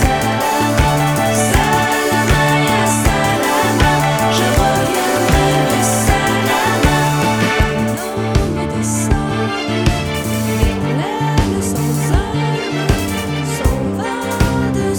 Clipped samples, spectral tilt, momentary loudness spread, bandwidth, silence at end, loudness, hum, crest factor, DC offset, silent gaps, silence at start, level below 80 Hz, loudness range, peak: under 0.1%; -4.5 dB/octave; 5 LU; over 20 kHz; 0 s; -15 LUFS; none; 14 dB; under 0.1%; none; 0 s; -24 dBFS; 4 LU; 0 dBFS